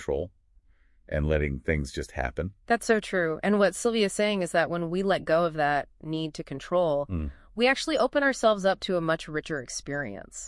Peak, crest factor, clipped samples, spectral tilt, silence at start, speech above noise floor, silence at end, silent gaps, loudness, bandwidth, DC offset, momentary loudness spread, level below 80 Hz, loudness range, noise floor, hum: -10 dBFS; 18 dB; under 0.1%; -5 dB/octave; 0 s; 33 dB; 0 s; none; -27 LUFS; 12 kHz; under 0.1%; 10 LU; -44 dBFS; 2 LU; -60 dBFS; none